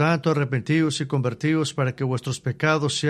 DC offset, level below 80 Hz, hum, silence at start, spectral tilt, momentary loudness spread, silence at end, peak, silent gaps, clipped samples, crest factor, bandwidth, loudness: under 0.1%; -60 dBFS; none; 0 s; -5.5 dB/octave; 5 LU; 0 s; -6 dBFS; none; under 0.1%; 16 dB; 12 kHz; -23 LUFS